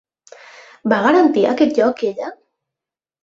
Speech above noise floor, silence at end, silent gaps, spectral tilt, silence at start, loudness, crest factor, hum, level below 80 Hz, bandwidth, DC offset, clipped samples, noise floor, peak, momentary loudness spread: 72 dB; 0.9 s; none; -6 dB/octave; 0.85 s; -16 LUFS; 16 dB; none; -62 dBFS; 7.6 kHz; under 0.1%; under 0.1%; -87 dBFS; -2 dBFS; 14 LU